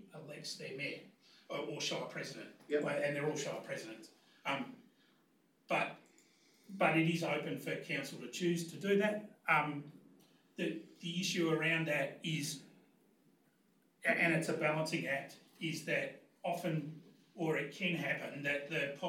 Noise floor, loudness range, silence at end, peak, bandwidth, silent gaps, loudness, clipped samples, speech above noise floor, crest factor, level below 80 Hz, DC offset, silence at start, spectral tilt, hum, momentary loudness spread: -73 dBFS; 4 LU; 0 s; -18 dBFS; 16.5 kHz; none; -37 LUFS; under 0.1%; 36 dB; 22 dB; under -90 dBFS; under 0.1%; 0 s; -4.5 dB/octave; none; 14 LU